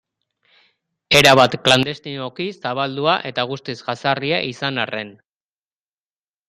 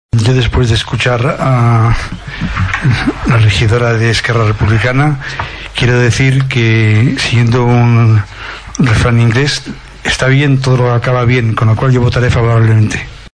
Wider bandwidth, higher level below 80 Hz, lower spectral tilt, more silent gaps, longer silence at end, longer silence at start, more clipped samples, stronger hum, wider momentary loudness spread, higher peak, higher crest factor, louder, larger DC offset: first, 15.5 kHz vs 10.5 kHz; second, -54 dBFS vs -26 dBFS; second, -3.5 dB/octave vs -6 dB/octave; neither; first, 1.4 s vs 0.1 s; first, 1.1 s vs 0.15 s; neither; neither; first, 15 LU vs 9 LU; about the same, 0 dBFS vs 0 dBFS; first, 20 dB vs 10 dB; second, -18 LUFS vs -11 LUFS; neither